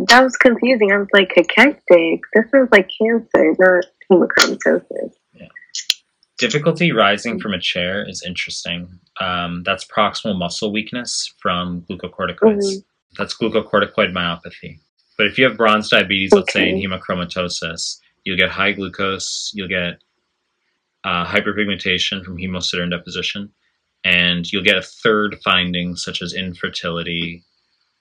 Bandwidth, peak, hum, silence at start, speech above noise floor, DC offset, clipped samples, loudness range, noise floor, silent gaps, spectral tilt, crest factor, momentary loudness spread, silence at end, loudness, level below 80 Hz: 17.5 kHz; 0 dBFS; none; 0 s; 54 dB; under 0.1%; under 0.1%; 8 LU; -71 dBFS; 13.02-13.10 s, 14.89-14.97 s; -4 dB/octave; 18 dB; 13 LU; 0.65 s; -17 LUFS; -56 dBFS